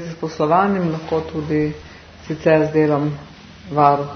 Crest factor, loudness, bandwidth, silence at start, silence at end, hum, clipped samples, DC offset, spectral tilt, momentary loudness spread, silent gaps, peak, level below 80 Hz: 18 dB; -19 LUFS; 6.6 kHz; 0 s; 0 s; none; under 0.1%; under 0.1%; -8 dB/octave; 14 LU; none; 0 dBFS; -50 dBFS